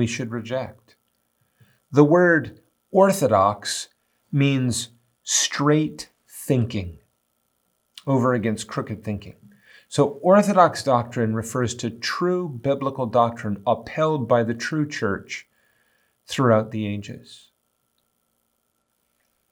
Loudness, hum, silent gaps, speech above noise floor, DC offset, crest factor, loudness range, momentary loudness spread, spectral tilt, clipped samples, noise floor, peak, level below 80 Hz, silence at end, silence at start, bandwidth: -22 LUFS; none; none; 51 dB; under 0.1%; 22 dB; 7 LU; 16 LU; -5 dB/octave; under 0.1%; -72 dBFS; 0 dBFS; -62 dBFS; 2.15 s; 0 s; over 20 kHz